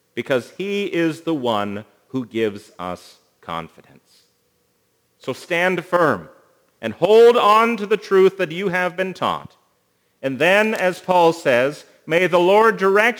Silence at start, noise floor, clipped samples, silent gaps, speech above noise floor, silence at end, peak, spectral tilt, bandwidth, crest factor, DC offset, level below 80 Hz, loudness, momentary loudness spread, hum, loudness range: 0.15 s; -65 dBFS; under 0.1%; none; 47 dB; 0 s; 0 dBFS; -5 dB/octave; over 20 kHz; 18 dB; under 0.1%; -68 dBFS; -18 LUFS; 17 LU; none; 13 LU